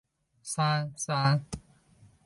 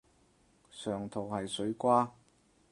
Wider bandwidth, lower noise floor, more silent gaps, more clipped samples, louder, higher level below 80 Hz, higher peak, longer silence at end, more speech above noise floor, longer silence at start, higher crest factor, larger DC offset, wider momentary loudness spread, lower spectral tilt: about the same, 11.5 kHz vs 11.5 kHz; second, -60 dBFS vs -68 dBFS; neither; neither; first, -29 LUFS vs -33 LUFS; first, -58 dBFS vs -68 dBFS; about the same, -12 dBFS vs -14 dBFS; about the same, 0.65 s vs 0.6 s; second, 31 dB vs 35 dB; second, 0.45 s vs 0.75 s; about the same, 18 dB vs 22 dB; neither; first, 17 LU vs 12 LU; about the same, -4.5 dB/octave vs -5.5 dB/octave